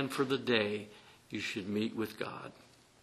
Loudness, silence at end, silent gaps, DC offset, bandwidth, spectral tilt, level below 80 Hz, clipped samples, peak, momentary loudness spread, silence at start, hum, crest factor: -35 LUFS; 0.45 s; none; under 0.1%; 13.5 kHz; -5 dB/octave; -74 dBFS; under 0.1%; -12 dBFS; 16 LU; 0 s; none; 24 dB